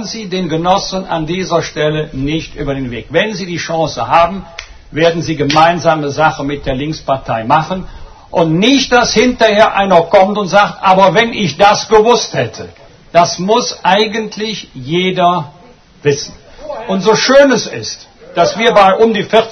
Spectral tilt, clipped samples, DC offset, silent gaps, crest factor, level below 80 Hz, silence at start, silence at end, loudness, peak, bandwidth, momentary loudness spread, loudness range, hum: -4.5 dB/octave; 0.3%; under 0.1%; none; 12 dB; -38 dBFS; 0 s; 0 s; -12 LUFS; 0 dBFS; 9.6 kHz; 13 LU; 6 LU; none